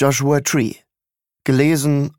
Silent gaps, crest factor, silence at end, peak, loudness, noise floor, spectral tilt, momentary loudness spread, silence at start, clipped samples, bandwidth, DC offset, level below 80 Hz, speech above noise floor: none; 16 dB; 0.1 s; -2 dBFS; -17 LUFS; -88 dBFS; -5.5 dB/octave; 8 LU; 0 s; under 0.1%; 17.5 kHz; under 0.1%; -60 dBFS; 72 dB